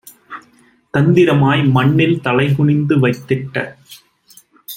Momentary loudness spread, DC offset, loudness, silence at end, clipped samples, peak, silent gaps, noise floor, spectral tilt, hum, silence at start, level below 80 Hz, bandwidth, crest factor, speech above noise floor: 20 LU; under 0.1%; -14 LUFS; 0 s; under 0.1%; -2 dBFS; none; -51 dBFS; -7.5 dB/octave; none; 0.3 s; -52 dBFS; 16.5 kHz; 14 dB; 38 dB